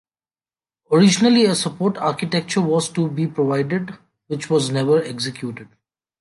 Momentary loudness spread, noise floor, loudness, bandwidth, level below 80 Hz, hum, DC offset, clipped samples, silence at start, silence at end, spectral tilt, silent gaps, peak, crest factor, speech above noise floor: 15 LU; under -90 dBFS; -19 LUFS; 11.5 kHz; -64 dBFS; none; under 0.1%; under 0.1%; 0.9 s; 0.55 s; -5 dB/octave; none; -4 dBFS; 16 dB; over 71 dB